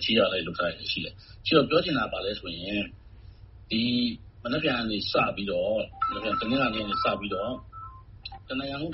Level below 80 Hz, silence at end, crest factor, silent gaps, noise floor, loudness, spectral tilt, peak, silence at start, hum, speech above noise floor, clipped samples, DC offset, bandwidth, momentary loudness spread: -50 dBFS; 0 s; 22 dB; none; -48 dBFS; -28 LUFS; -2.5 dB/octave; -8 dBFS; 0 s; none; 20 dB; under 0.1%; under 0.1%; 6 kHz; 14 LU